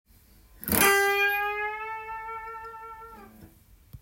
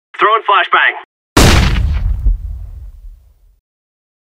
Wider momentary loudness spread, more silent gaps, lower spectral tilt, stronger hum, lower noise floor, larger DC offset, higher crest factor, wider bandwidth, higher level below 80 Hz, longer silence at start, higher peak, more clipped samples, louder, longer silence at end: about the same, 22 LU vs 20 LU; second, none vs 1.05-1.36 s; second, -2 dB/octave vs -4 dB/octave; neither; first, -56 dBFS vs -42 dBFS; neither; first, 24 dB vs 14 dB; about the same, 17 kHz vs 16 kHz; second, -54 dBFS vs -18 dBFS; first, 0.6 s vs 0.2 s; second, -6 dBFS vs 0 dBFS; neither; second, -25 LUFS vs -12 LUFS; second, 0.05 s vs 1.15 s